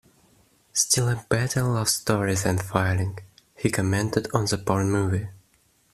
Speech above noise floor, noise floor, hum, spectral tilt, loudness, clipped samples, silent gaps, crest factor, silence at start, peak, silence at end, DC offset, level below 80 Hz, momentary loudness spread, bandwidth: 40 dB; -63 dBFS; none; -4.5 dB/octave; -24 LUFS; under 0.1%; none; 22 dB; 0.75 s; -4 dBFS; 0.6 s; under 0.1%; -52 dBFS; 7 LU; 14.5 kHz